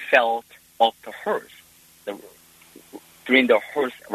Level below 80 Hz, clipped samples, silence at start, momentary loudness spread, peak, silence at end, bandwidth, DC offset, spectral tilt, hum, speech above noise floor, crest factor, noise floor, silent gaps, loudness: -70 dBFS; under 0.1%; 0 s; 20 LU; -2 dBFS; 0 s; 13.5 kHz; under 0.1%; -3.5 dB/octave; none; 28 dB; 22 dB; -50 dBFS; none; -22 LUFS